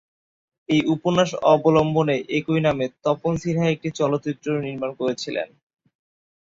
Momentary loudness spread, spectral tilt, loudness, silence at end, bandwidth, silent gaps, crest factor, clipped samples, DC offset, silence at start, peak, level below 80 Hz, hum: 8 LU; -6.5 dB/octave; -22 LUFS; 1.05 s; 7.8 kHz; none; 20 dB; under 0.1%; under 0.1%; 0.7 s; -4 dBFS; -54 dBFS; none